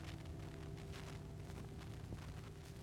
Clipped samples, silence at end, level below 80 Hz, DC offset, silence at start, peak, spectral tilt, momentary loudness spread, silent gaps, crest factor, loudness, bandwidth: under 0.1%; 0 s; -58 dBFS; under 0.1%; 0 s; -36 dBFS; -6 dB/octave; 1 LU; none; 14 dB; -52 LUFS; 17.5 kHz